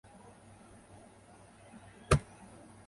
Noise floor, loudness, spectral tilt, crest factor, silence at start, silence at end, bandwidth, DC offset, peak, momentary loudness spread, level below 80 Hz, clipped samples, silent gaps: -58 dBFS; -32 LUFS; -5.5 dB/octave; 28 dB; 2.1 s; 0.7 s; 11.5 kHz; under 0.1%; -12 dBFS; 26 LU; -48 dBFS; under 0.1%; none